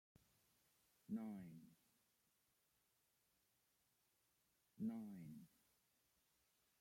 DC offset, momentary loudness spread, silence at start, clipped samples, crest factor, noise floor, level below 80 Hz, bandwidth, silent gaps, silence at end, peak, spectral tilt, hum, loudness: under 0.1%; 13 LU; 1.1 s; under 0.1%; 20 dB; -84 dBFS; under -90 dBFS; 16.5 kHz; none; 1.35 s; -38 dBFS; -7.5 dB/octave; none; -53 LUFS